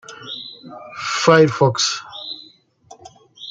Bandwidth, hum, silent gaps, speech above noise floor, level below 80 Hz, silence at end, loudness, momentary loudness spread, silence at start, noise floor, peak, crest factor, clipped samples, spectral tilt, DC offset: 9.4 kHz; none; none; 34 dB; -62 dBFS; 0 s; -16 LUFS; 22 LU; 0.1 s; -50 dBFS; -2 dBFS; 20 dB; under 0.1%; -4 dB/octave; under 0.1%